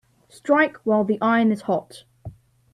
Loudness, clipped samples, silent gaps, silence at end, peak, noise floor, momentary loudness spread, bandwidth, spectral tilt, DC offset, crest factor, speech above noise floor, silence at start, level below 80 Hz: -21 LUFS; under 0.1%; none; 0.4 s; -6 dBFS; -42 dBFS; 10 LU; 11.5 kHz; -7 dB/octave; under 0.1%; 18 dB; 21 dB; 0.45 s; -60 dBFS